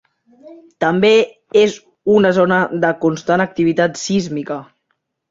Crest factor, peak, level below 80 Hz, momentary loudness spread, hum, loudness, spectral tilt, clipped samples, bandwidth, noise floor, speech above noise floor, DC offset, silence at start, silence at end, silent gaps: 14 dB; -2 dBFS; -56 dBFS; 11 LU; none; -16 LUFS; -5.5 dB/octave; under 0.1%; 7.8 kHz; -70 dBFS; 55 dB; under 0.1%; 0.45 s; 0.65 s; none